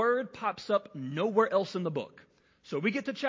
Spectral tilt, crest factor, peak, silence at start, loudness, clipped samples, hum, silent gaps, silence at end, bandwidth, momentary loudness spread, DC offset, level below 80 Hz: -6.5 dB/octave; 20 dB; -12 dBFS; 0 s; -31 LUFS; under 0.1%; none; none; 0 s; 7.6 kHz; 11 LU; under 0.1%; -76 dBFS